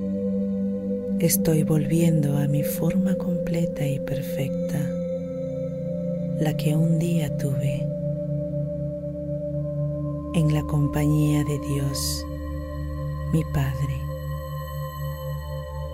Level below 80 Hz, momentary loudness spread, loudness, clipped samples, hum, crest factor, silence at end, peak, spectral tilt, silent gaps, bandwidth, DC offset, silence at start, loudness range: -40 dBFS; 11 LU; -25 LUFS; under 0.1%; 50 Hz at -50 dBFS; 16 dB; 0 s; -8 dBFS; -6.5 dB/octave; none; 16 kHz; under 0.1%; 0 s; 5 LU